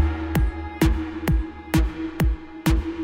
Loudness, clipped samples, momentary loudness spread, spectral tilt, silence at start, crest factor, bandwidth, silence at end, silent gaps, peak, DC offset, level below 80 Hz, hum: -24 LUFS; under 0.1%; 4 LU; -6.5 dB/octave; 0 s; 14 dB; 17 kHz; 0 s; none; -8 dBFS; under 0.1%; -26 dBFS; none